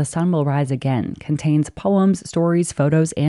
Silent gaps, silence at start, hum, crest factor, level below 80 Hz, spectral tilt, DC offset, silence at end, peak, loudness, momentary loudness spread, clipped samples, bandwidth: none; 0 s; none; 12 dB; -52 dBFS; -7 dB/octave; under 0.1%; 0 s; -6 dBFS; -19 LUFS; 5 LU; under 0.1%; 11.5 kHz